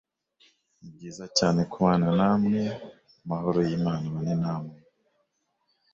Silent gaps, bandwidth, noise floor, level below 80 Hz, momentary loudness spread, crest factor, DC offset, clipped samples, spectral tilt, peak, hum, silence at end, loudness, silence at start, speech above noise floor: none; 7.6 kHz; -75 dBFS; -58 dBFS; 19 LU; 20 dB; under 0.1%; under 0.1%; -6 dB/octave; -8 dBFS; none; 1.2 s; -26 LUFS; 0.85 s; 49 dB